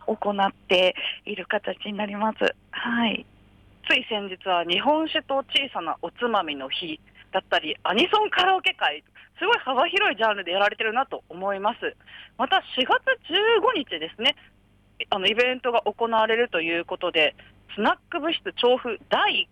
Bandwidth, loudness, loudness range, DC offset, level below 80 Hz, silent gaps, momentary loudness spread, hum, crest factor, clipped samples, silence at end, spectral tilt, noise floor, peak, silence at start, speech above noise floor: 11.5 kHz; -24 LUFS; 3 LU; under 0.1%; -62 dBFS; none; 10 LU; none; 16 dB; under 0.1%; 0.1 s; -4 dB/octave; -54 dBFS; -10 dBFS; 0 s; 30 dB